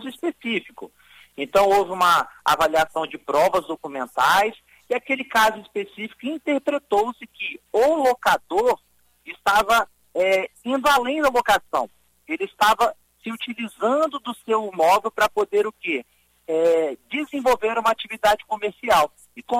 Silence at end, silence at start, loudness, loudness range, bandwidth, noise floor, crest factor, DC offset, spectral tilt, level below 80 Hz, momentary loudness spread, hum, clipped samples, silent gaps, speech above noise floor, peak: 0 s; 0 s; -21 LUFS; 2 LU; 16 kHz; -52 dBFS; 16 dB; under 0.1%; -3 dB/octave; -54 dBFS; 12 LU; none; under 0.1%; none; 31 dB; -6 dBFS